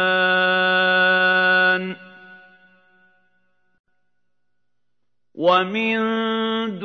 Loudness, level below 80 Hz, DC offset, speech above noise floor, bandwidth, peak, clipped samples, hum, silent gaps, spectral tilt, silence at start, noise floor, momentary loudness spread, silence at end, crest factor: -18 LUFS; -76 dBFS; under 0.1%; 61 dB; 6.4 kHz; -4 dBFS; under 0.1%; 60 Hz at -75 dBFS; 3.79-3.84 s; -6 dB/octave; 0 s; -81 dBFS; 8 LU; 0 s; 18 dB